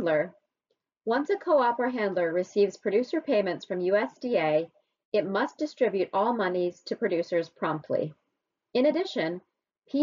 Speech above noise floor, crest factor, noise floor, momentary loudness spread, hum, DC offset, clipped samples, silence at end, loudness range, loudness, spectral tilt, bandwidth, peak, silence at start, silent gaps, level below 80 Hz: 55 dB; 14 dB; -82 dBFS; 7 LU; none; under 0.1%; under 0.1%; 0 s; 3 LU; -28 LUFS; -4 dB/octave; 7.4 kHz; -12 dBFS; 0 s; 5.05-5.12 s; -76 dBFS